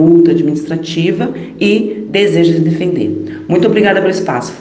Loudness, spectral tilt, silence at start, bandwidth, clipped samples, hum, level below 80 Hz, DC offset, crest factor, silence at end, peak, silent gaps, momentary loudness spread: -12 LUFS; -6.5 dB/octave; 0 s; 8.8 kHz; under 0.1%; none; -52 dBFS; under 0.1%; 12 dB; 0 s; 0 dBFS; none; 8 LU